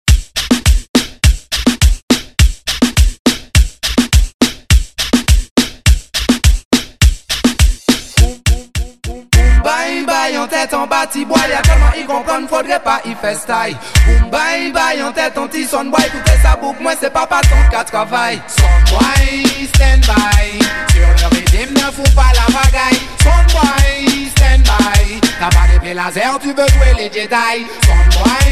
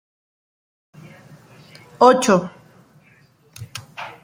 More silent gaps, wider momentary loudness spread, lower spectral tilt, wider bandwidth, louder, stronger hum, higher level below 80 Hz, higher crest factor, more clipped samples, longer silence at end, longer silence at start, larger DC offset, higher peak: first, 0.89-0.94 s, 2.03-2.08 s, 3.19-3.25 s, 4.34-4.39 s, 5.51-5.56 s, 6.65-6.71 s vs none; second, 6 LU vs 22 LU; about the same, -4.5 dB/octave vs -4.5 dB/octave; second, 14.5 kHz vs 16.5 kHz; about the same, -13 LUFS vs -15 LUFS; neither; first, -12 dBFS vs -66 dBFS; second, 10 dB vs 22 dB; neither; about the same, 0 s vs 0.1 s; second, 0.05 s vs 2 s; first, 1% vs under 0.1%; about the same, 0 dBFS vs -2 dBFS